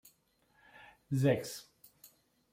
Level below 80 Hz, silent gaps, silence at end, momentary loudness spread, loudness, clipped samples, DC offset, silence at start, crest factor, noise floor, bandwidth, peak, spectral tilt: -72 dBFS; none; 0.9 s; 26 LU; -34 LUFS; under 0.1%; under 0.1%; 0.8 s; 20 dB; -72 dBFS; 16.5 kHz; -18 dBFS; -6.5 dB/octave